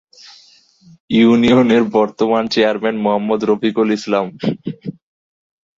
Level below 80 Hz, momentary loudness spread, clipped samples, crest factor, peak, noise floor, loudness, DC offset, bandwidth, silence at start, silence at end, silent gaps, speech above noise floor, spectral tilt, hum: -54 dBFS; 11 LU; under 0.1%; 14 dB; -2 dBFS; -49 dBFS; -15 LUFS; under 0.1%; 7.6 kHz; 1.1 s; 0.85 s; none; 35 dB; -6.5 dB/octave; none